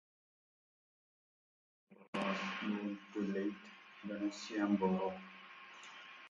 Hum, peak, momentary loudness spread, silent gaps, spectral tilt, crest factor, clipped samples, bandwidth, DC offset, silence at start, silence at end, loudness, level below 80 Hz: none; -22 dBFS; 18 LU; 2.08-2.13 s; -6 dB/octave; 20 dB; under 0.1%; 7.8 kHz; under 0.1%; 1.9 s; 0 s; -39 LUFS; -80 dBFS